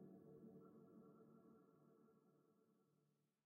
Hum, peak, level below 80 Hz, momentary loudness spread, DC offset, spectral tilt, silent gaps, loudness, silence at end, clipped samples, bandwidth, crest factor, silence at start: none; -52 dBFS; under -90 dBFS; 5 LU; under 0.1%; -5.5 dB/octave; none; -66 LUFS; 0.15 s; under 0.1%; 1.8 kHz; 16 dB; 0 s